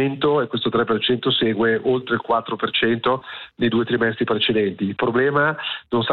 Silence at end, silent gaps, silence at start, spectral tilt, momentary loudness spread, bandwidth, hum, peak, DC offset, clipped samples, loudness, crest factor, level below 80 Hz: 0 s; none; 0 s; -9 dB/octave; 5 LU; 4.5 kHz; none; -8 dBFS; under 0.1%; under 0.1%; -20 LUFS; 12 dB; -56 dBFS